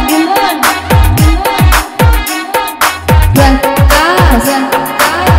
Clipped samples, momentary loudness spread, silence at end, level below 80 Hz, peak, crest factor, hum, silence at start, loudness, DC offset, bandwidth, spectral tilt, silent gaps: 0.3%; 5 LU; 0 s; -14 dBFS; 0 dBFS; 8 dB; none; 0 s; -9 LUFS; under 0.1%; 16.5 kHz; -5 dB/octave; none